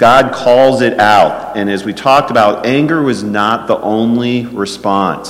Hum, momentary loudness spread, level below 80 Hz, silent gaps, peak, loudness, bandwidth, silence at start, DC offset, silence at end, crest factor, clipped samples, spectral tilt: none; 8 LU; -44 dBFS; none; 0 dBFS; -11 LUFS; 16 kHz; 0 s; under 0.1%; 0 s; 10 dB; under 0.1%; -5.5 dB/octave